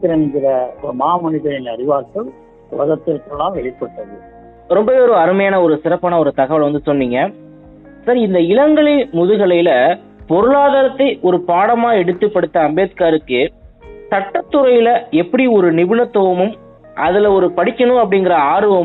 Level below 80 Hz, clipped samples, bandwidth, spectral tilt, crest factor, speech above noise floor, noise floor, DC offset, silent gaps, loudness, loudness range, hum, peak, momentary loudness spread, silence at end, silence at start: -48 dBFS; under 0.1%; 4.1 kHz; -10 dB/octave; 12 dB; 26 dB; -39 dBFS; under 0.1%; none; -14 LUFS; 6 LU; none; -2 dBFS; 10 LU; 0 s; 0 s